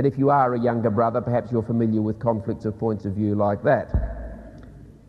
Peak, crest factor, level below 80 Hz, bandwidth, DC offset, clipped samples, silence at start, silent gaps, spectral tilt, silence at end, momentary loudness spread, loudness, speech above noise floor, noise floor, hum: -6 dBFS; 16 dB; -38 dBFS; 6 kHz; under 0.1%; under 0.1%; 0 s; none; -10.5 dB/octave; 0.15 s; 9 LU; -23 LUFS; 22 dB; -44 dBFS; none